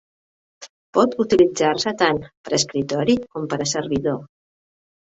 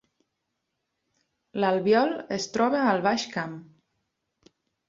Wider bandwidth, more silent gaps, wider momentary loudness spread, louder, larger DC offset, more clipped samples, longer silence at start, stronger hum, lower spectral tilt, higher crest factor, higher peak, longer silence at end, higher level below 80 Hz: about the same, 8.4 kHz vs 7.8 kHz; first, 0.70-0.93 s, 2.37-2.44 s vs none; second, 8 LU vs 14 LU; first, -20 LUFS vs -25 LUFS; neither; neither; second, 0.6 s vs 1.55 s; neither; about the same, -4 dB/octave vs -5 dB/octave; about the same, 18 dB vs 20 dB; first, -4 dBFS vs -8 dBFS; second, 0.8 s vs 1.25 s; first, -54 dBFS vs -70 dBFS